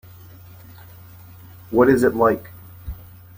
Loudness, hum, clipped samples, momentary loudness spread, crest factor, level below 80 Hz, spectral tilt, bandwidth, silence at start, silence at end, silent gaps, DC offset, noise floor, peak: -18 LUFS; none; under 0.1%; 24 LU; 20 dB; -44 dBFS; -7.5 dB/octave; 16.5 kHz; 1.7 s; 0.45 s; none; under 0.1%; -43 dBFS; -2 dBFS